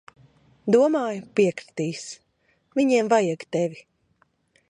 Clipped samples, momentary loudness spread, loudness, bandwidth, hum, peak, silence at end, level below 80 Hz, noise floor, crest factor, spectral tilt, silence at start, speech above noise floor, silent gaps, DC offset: under 0.1%; 14 LU; -23 LUFS; 10.5 kHz; none; -6 dBFS; 0.9 s; -72 dBFS; -66 dBFS; 20 dB; -5.5 dB/octave; 0.65 s; 44 dB; none; under 0.1%